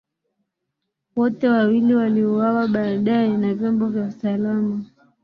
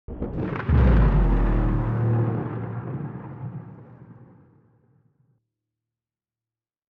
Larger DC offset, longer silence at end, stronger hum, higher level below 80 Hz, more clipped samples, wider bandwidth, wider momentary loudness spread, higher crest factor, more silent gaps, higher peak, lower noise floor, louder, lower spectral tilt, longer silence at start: neither; second, 0.4 s vs 2.65 s; neither; second, -64 dBFS vs -28 dBFS; neither; first, 5.2 kHz vs 4.2 kHz; second, 7 LU vs 17 LU; about the same, 14 dB vs 16 dB; neither; about the same, -6 dBFS vs -8 dBFS; second, -79 dBFS vs under -90 dBFS; first, -20 LUFS vs -24 LUFS; about the same, -9.5 dB/octave vs -10.5 dB/octave; first, 1.15 s vs 0.1 s